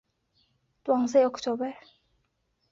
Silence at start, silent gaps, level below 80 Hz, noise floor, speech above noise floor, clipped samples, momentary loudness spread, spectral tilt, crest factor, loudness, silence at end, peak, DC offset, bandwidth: 0.85 s; none; -72 dBFS; -75 dBFS; 49 dB; under 0.1%; 13 LU; -4.5 dB/octave; 18 dB; -26 LUFS; 0.95 s; -10 dBFS; under 0.1%; 7.6 kHz